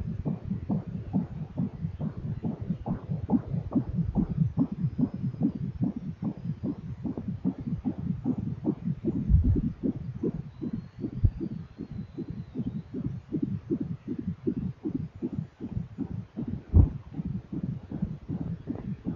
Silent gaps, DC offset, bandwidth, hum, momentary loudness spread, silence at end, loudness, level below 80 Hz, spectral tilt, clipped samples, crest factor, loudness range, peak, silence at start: none; under 0.1%; 5.2 kHz; none; 9 LU; 0 s; -32 LUFS; -38 dBFS; -11.5 dB/octave; under 0.1%; 24 dB; 4 LU; -8 dBFS; 0 s